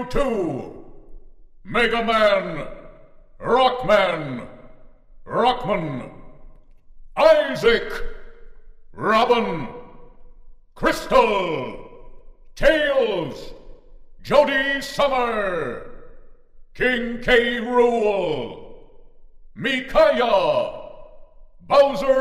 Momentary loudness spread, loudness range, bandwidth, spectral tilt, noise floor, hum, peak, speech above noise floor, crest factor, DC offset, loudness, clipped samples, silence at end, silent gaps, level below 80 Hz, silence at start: 17 LU; 3 LU; 15.5 kHz; -5 dB/octave; -45 dBFS; none; -2 dBFS; 26 dB; 20 dB; under 0.1%; -20 LUFS; under 0.1%; 0 s; none; -40 dBFS; 0 s